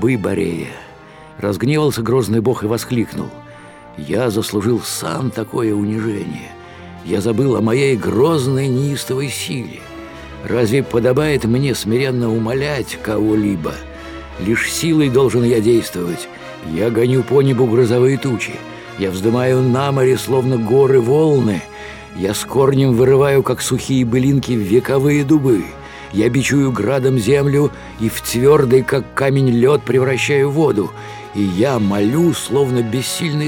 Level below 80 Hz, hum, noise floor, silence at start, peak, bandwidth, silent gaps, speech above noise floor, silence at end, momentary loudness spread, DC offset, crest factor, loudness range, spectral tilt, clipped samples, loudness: -44 dBFS; none; -39 dBFS; 0 s; 0 dBFS; 19 kHz; none; 24 dB; 0 s; 14 LU; under 0.1%; 14 dB; 5 LU; -6 dB/octave; under 0.1%; -16 LUFS